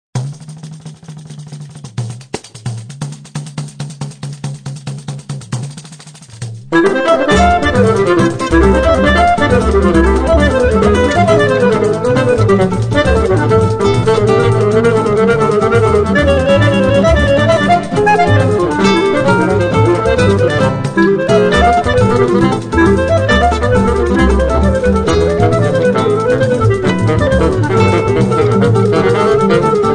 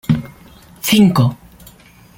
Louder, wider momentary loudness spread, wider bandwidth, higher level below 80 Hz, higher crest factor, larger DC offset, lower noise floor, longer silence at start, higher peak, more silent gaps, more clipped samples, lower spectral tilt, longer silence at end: first, -11 LUFS vs -15 LUFS; first, 15 LU vs 12 LU; second, 10 kHz vs 17 kHz; first, -24 dBFS vs -46 dBFS; about the same, 12 dB vs 16 dB; neither; second, -34 dBFS vs -44 dBFS; about the same, 0.15 s vs 0.1 s; about the same, 0 dBFS vs -2 dBFS; neither; neither; about the same, -6.5 dB/octave vs -5.5 dB/octave; second, 0 s vs 0.85 s